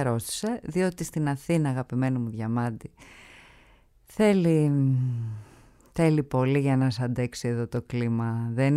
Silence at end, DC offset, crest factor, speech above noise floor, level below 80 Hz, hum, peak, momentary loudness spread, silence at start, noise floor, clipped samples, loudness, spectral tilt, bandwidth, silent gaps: 0 s; under 0.1%; 16 dB; 32 dB; -56 dBFS; none; -10 dBFS; 10 LU; 0 s; -58 dBFS; under 0.1%; -26 LUFS; -7 dB/octave; 14.5 kHz; none